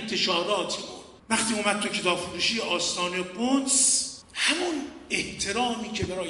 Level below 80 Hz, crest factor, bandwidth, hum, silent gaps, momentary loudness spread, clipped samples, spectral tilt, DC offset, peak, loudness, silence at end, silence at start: -56 dBFS; 18 dB; 11.5 kHz; none; none; 10 LU; under 0.1%; -1.5 dB/octave; under 0.1%; -8 dBFS; -25 LUFS; 0 s; 0 s